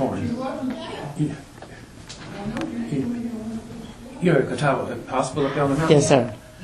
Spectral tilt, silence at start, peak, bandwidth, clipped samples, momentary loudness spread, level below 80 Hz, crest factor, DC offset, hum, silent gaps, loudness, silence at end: -6 dB/octave; 0 s; -2 dBFS; 12.5 kHz; under 0.1%; 21 LU; -50 dBFS; 22 dB; under 0.1%; none; none; -23 LUFS; 0 s